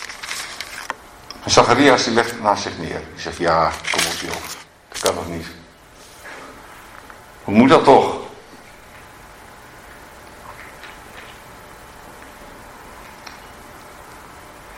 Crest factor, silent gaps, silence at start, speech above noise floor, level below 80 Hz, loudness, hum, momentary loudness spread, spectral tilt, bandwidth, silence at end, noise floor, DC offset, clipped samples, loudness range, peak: 22 dB; none; 0 s; 28 dB; -48 dBFS; -17 LUFS; none; 27 LU; -3.5 dB/octave; 16 kHz; 0 s; -44 dBFS; under 0.1%; under 0.1%; 21 LU; 0 dBFS